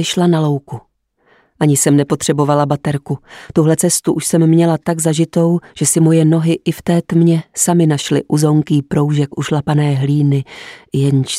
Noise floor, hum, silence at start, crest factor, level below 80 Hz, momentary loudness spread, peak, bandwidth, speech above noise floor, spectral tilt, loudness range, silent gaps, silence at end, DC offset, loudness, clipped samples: -56 dBFS; none; 0 s; 12 dB; -52 dBFS; 8 LU; 0 dBFS; 15.5 kHz; 42 dB; -5.5 dB/octave; 2 LU; none; 0 s; under 0.1%; -14 LUFS; under 0.1%